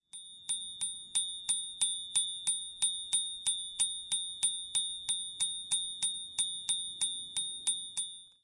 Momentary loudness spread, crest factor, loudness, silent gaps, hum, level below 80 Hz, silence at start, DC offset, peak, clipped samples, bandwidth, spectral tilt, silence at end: 6 LU; 20 dB; -32 LUFS; none; none; -74 dBFS; 0.15 s; under 0.1%; -16 dBFS; under 0.1%; 11.5 kHz; 3 dB/octave; 0.15 s